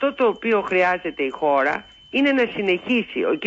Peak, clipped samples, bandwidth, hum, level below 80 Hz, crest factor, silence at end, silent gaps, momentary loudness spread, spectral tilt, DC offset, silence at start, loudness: -8 dBFS; under 0.1%; 7.8 kHz; none; -60 dBFS; 12 dB; 0 s; none; 5 LU; -6 dB/octave; under 0.1%; 0 s; -21 LUFS